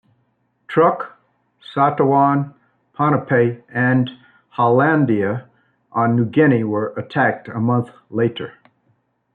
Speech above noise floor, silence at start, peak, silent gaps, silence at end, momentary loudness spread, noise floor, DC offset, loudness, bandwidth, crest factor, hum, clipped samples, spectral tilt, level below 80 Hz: 48 dB; 0.7 s; -2 dBFS; none; 0.85 s; 13 LU; -65 dBFS; under 0.1%; -18 LUFS; 4.5 kHz; 16 dB; 60 Hz at -45 dBFS; under 0.1%; -10 dB/octave; -64 dBFS